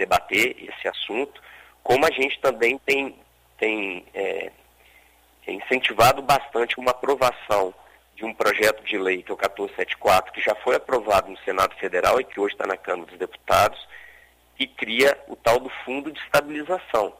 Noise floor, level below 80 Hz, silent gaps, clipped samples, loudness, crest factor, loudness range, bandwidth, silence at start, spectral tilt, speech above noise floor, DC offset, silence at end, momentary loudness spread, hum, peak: -56 dBFS; -54 dBFS; none; under 0.1%; -23 LUFS; 18 dB; 2 LU; 16 kHz; 0 s; -3.5 dB/octave; 33 dB; under 0.1%; 0.05 s; 11 LU; 60 Hz at -60 dBFS; -6 dBFS